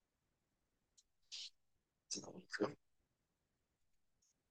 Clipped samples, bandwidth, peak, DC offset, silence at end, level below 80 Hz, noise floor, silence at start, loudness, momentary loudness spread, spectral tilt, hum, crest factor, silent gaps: under 0.1%; 10 kHz; -28 dBFS; under 0.1%; 1.75 s; under -90 dBFS; -88 dBFS; 1.3 s; -48 LUFS; 10 LU; -2.5 dB/octave; none; 26 dB; none